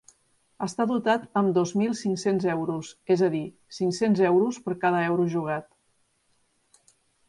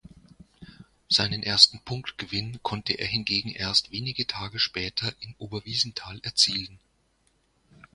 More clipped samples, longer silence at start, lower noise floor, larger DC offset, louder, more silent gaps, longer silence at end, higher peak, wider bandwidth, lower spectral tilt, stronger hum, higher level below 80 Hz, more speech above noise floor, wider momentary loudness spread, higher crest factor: neither; about the same, 0.6 s vs 0.6 s; about the same, -69 dBFS vs -68 dBFS; neither; about the same, -25 LUFS vs -25 LUFS; neither; first, 1.65 s vs 1.2 s; second, -10 dBFS vs 0 dBFS; about the same, 11.5 kHz vs 11.5 kHz; first, -6 dB/octave vs -2.5 dB/octave; neither; second, -70 dBFS vs -56 dBFS; first, 45 dB vs 41 dB; second, 10 LU vs 17 LU; second, 18 dB vs 28 dB